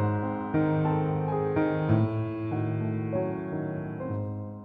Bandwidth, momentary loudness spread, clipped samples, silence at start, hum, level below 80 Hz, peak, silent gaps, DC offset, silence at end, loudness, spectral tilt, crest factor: 4.5 kHz; 8 LU; under 0.1%; 0 s; none; -56 dBFS; -12 dBFS; none; under 0.1%; 0 s; -29 LUFS; -11.5 dB/octave; 16 dB